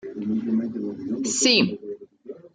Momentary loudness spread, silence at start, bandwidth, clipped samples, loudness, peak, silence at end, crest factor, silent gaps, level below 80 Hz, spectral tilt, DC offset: 22 LU; 0.05 s; 9.6 kHz; under 0.1%; -23 LUFS; -6 dBFS; 0.05 s; 20 dB; none; -66 dBFS; -3 dB/octave; under 0.1%